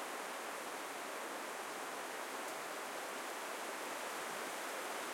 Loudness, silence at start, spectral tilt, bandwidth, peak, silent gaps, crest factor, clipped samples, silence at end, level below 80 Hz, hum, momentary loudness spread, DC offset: -43 LUFS; 0 s; -1 dB/octave; 16.5 kHz; -30 dBFS; none; 14 dB; under 0.1%; 0 s; under -90 dBFS; none; 2 LU; under 0.1%